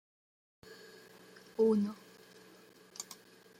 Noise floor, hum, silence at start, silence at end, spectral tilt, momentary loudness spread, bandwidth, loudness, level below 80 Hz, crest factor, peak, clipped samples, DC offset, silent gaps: -60 dBFS; none; 0.7 s; 0.45 s; -6 dB/octave; 27 LU; 16 kHz; -34 LUFS; -82 dBFS; 20 dB; -20 dBFS; under 0.1%; under 0.1%; none